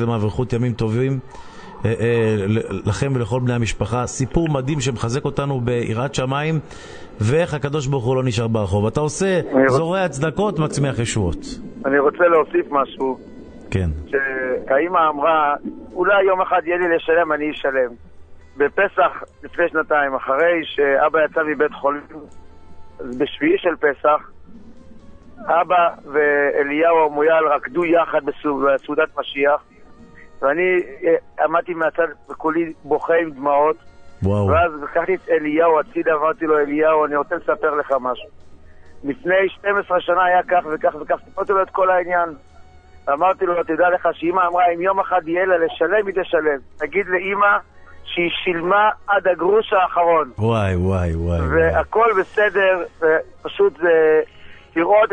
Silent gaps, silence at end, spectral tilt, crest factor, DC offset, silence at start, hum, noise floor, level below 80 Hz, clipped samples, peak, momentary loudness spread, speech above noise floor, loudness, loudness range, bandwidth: none; 0 s; -6 dB/octave; 16 dB; under 0.1%; 0 s; none; -43 dBFS; -44 dBFS; under 0.1%; -2 dBFS; 8 LU; 25 dB; -19 LUFS; 4 LU; 9.6 kHz